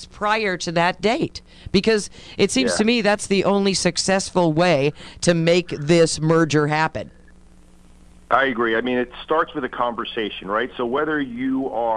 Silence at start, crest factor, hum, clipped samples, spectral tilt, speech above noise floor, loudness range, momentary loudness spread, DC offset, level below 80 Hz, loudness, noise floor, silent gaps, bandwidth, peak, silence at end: 0 s; 18 dB; none; under 0.1%; -4.5 dB/octave; 27 dB; 5 LU; 7 LU; under 0.1%; -48 dBFS; -20 LUFS; -47 dBFS; none; 11.5 kHz; -2 dBFS; 0 s